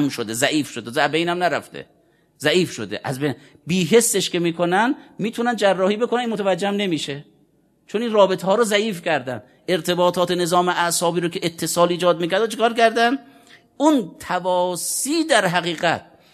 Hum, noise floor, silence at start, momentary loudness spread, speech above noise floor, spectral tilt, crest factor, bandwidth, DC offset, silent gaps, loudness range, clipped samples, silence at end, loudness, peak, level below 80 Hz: none; -60 dBFS; 0 s; 9 LU; 40 dB; -4 dB/octave; 20 dB; 14 kHz; under 0.1%; none; 3 LU; under 0.1%; 0.3 s; -20 LUFS; 0 dBFS; -66 dBFS